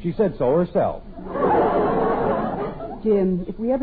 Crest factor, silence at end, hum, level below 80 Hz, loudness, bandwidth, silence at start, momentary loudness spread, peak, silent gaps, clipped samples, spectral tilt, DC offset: 12 dB; 0 s; none; -40 dBFS; -22 LUFS; 4.8 kHz; 0 s; 9 LU; -8 dBFS; none; under 0.1%; -12 dB/octave; under 0.1%